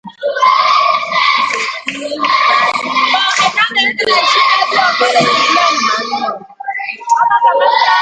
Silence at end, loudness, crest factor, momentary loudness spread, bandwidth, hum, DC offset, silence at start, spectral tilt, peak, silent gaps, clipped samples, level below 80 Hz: 0 s; -11 LUFS; 12 dB; 10 LU; 9.4 kHz; none; under 0.1%; 0.05 s; -1.5 dB/octave; 0 dBFS; none; under 0.1%; -62 dBFS